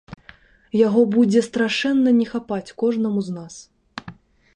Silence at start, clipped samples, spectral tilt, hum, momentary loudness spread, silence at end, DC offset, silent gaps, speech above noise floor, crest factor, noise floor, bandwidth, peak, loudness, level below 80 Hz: 0.1 s; under 0.1%; -6 dB/octave; none; 21 LU; 0.45 s; under 0.1%; none; 31 dB; 16 dB; -50 dBFS; 10 kHz; -4 dBFS; -20 LUFS; -60 dBFS